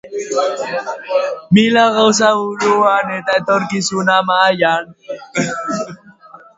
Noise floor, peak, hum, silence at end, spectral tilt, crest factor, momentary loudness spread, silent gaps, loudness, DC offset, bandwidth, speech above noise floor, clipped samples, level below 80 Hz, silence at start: -41 dBFS; 0 dBFS; none; 0.2 s; -4 dB/octave; 16 dB; 11 LU; none; -15 LUFS; under 0.1%; 8 kHz; 26 dB; under 0.1%; -58 dBFS; 0.05 s